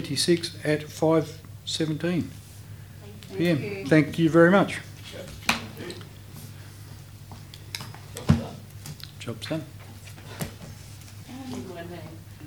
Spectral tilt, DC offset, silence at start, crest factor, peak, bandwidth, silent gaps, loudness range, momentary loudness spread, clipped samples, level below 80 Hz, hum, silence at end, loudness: -5.5 dB/octave; under 0.1%; 0 s; 22 dB; -4 dBFS; over 20 kHz; none; 13 LU; 21 LU; under 0.1%; -52 dBFS; none; 0 s; -26 LUFS